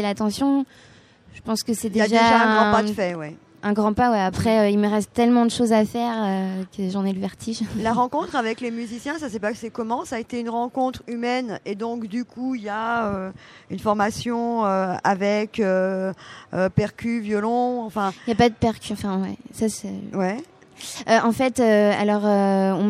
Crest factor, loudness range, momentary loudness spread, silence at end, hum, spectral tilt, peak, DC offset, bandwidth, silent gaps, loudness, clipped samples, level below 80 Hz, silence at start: 18 dB; 7 LU; 11 LU; 0 s; none; -5.5 dB/octave; -4 dBFS; under 0.1%; 14.5 kHz; none; -22 LUFS; under 0.1%; -52 dBFS; 0 s